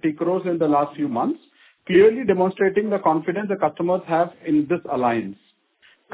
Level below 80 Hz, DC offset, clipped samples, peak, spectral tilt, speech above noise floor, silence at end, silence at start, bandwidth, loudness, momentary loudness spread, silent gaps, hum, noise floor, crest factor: -62 dBFS; under 0.1%; under 0.1%; -6 dBFS; -11 dB/octave; 38 dB; 0.8 s; 0.05 s; 4 kHz; -21 LUFS; 9 LU; none; none; -58 dBFS; 16 dB